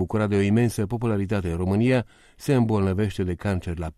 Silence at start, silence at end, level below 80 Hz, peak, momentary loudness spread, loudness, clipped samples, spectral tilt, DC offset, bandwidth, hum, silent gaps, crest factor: 0 s; 0.05 s; -44 dBFS; -8 dBFS; 6 LU; -24 LUFS; under 0.1%; -7.5 dB/octave; under 0.1%; 14 kHz; none; none; 14 dB